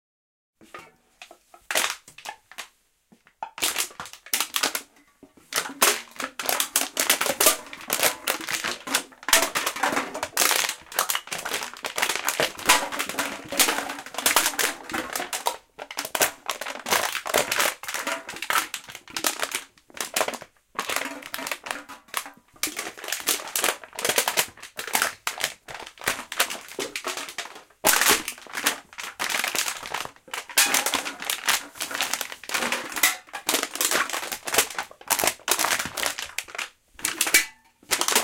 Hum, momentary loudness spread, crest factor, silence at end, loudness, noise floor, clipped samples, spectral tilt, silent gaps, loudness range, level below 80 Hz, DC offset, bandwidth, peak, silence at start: none; 14 LU; 26 dB; 0 s; -24 LUFS; -61 dBFS; under 0.1%; 0.5 dB/octave; none; 6 LU; -62 dBFS; under 0.1%; 17 kHz; -2 dBFS; 0.6 s